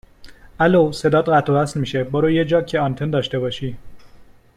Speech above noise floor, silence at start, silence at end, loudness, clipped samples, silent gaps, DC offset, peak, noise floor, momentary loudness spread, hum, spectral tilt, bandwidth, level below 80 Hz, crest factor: 27 dB; 0.2 s; 0.35 s; -19 LUFS; under 0.1%; none; under 0.1%; -4 dBFS; -45 dBFS; 8 LU; none; -6.5 dB/octave; 13 kHz; -48 dBFS; 16 dB